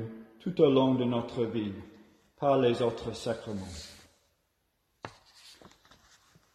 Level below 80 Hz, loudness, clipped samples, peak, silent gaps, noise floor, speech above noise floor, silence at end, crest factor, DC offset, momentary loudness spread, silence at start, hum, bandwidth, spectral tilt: -62 dBFS; -29 LUFS; under 0.1%; -10 dBFS; none; -76 dBFS; 48 dB; 1 s; 22 dB; under 0.1%; 23 LU; 0 s; none; 13 kHz; -7 dB/octave